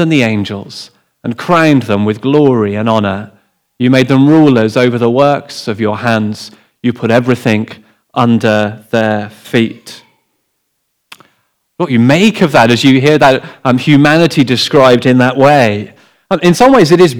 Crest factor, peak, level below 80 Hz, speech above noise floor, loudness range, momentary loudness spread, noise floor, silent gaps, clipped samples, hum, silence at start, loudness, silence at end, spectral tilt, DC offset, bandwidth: 10 dB; 0 dBFS; -50 dBFS; 56 dB; 7 LU; 14 LU; -65 dBFS; none; 1%; none; 0 s; -10 LUFS; 0 s; -6 dB/octave; under 0.1%; 17.5 kHz